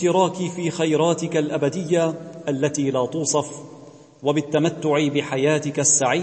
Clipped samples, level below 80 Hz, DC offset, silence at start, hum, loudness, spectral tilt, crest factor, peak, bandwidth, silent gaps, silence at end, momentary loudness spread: under 0.1%; -68 dBFS; under 0.1%; 0 s; none; -21 LUFS; -4 dB/octave; 16 dB; -4 dBFS; 8.8 kHz; none; 0 s; 8 LU